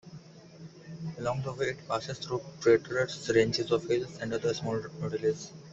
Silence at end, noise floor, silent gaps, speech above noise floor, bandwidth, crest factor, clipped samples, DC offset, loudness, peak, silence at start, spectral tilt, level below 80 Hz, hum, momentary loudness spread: 0 s; -50 dBFS; none; 20 dB; 8 kHz; 20 dB; under 0.1%; under 0.1%; -31 LUFS; -12 dBFS; 0.05 s; -5 dB/octave; -62 dBFS; none; 20 LU